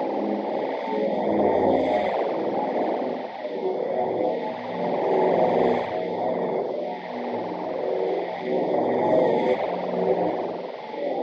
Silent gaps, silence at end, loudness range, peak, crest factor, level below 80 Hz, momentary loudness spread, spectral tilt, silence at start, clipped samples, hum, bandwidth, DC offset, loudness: none; 0 s; 2 LU; -8 dBFS; 16 dB; -66 dBFS; 9 LU; -8 dB/octave; 0 s; under 0.1%; none; 6.8 kHz; under 0.1%; -25 LUFS